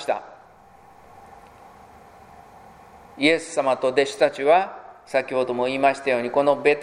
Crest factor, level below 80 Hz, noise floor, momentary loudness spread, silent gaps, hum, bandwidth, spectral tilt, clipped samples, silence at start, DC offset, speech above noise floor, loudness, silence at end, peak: 22 dB; -64 dBFS; -50 dBFS; 8 LU; none; none; 12 kHz; -4 dB/octave; under 0.1%; 0 s; under 0.1%; 30 dB; -22 LUFS; 0 s; -2 dBFS